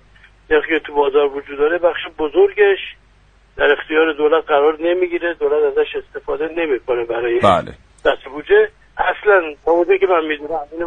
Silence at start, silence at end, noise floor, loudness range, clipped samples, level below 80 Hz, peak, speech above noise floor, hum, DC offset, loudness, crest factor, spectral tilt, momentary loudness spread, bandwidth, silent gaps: 0.5 s; 0 s; -51 dBFS; 2 LU; under 0.1%; -46 dBFS; 0 dBFS; 35 dB; none; under 0.1%; -17 LUFS; 16 dB; -6 dB/octave; 8 LU; 9.4 kHz; none